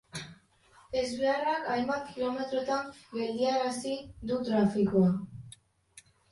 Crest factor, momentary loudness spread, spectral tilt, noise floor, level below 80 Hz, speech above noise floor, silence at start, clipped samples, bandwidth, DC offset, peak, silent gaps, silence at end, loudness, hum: 18 dB; 16 LU; -6 dB/octave; -61 dBFS; -62 dBFS; 32 dB; 0.15 s; under 0.1%; 11.5 kHz; under 0.1%; -14 dBFS; none; 0.3 s; -31 LUFS; none